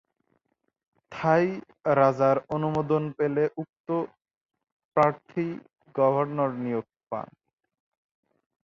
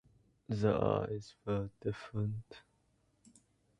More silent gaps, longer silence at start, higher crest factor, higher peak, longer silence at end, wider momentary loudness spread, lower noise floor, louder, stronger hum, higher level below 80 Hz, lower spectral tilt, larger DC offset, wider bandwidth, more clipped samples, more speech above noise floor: first, 3.69-3.73 s, 3.80-3.84 s, 4.37-4.41 s, 4.72-4.91 s vs none; first, 1.1 s vs 0.5 s; about the same, 20 dB vs 22 dB; first, -8 dBFS vs -16 dBFS; first, 1.4 s vs 1.2 s; about the same, 14 LU vs 14 LU; about the same, -75 dBFS vs -74 dBFS; first, -26 LUFS vs -37 LUFS; neither; second, -66 dBFS vs -60 dBFS; about the same, -8.5 dB/octave vs -8 dB/octave; neither; second, 7.4 kHz vs 9.8 kHz; neither; first, 50 dB vs 39 dB